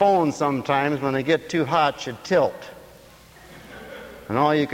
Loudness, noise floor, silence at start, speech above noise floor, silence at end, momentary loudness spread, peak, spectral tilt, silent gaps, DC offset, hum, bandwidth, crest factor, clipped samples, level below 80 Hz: -22 LUFS; -48 dBFS; 0 s; 27 dB; 0 s; 19 LU; -6 dBFS; -5.5 dB/octave; none; under 0.1%; none; 16.5 kHz; 18 dB; under 0.1%; -56 dBFS